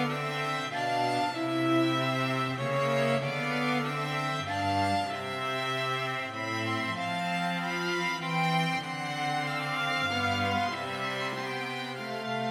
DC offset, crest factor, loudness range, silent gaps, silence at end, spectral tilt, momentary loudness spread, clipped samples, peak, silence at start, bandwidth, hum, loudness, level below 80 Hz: under 0.1%; 16 dB; 2 LU; none; 0 s; -5 dB/octave; 5 LU; under 0.1%; -14 dBFS; 0 s; 16 kHz; none; -30 LUFS; -72 dBFS